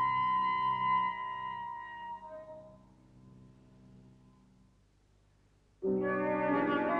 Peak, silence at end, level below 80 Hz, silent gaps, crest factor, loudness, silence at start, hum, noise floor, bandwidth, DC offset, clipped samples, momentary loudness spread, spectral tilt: -18 dBFS; 0 s; -66 dBFS; none; 18 dB; -33 LUFS; 0 s; 50 Hz at -70 dBFS; -67 dBFS; 5.4 kHz; under 0.1%; under 0.1%; 17 LU; -8 dB/octave